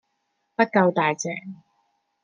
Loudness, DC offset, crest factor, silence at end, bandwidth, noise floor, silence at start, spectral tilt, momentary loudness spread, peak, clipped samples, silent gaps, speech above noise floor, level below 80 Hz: -22 LUFS; under 0.1%; 22 dB; 0.7 s; 9.6 kHz; -74 dBFS; 0.6 s; -5 dB/octave; 16 LU; -4 dBFS; under 0.1%; none; 52 dB; -74 dBFS